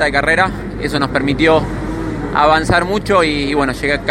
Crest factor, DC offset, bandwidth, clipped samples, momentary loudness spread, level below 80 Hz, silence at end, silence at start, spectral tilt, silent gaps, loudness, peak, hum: 14 dB; under 0.1%; 16.5 kHz; under 0.1%; 9 LU; -30 dBFS; 0 s; 0 s; -5.5 dB/octave; none; -15 LUFS; 0 dBFS; none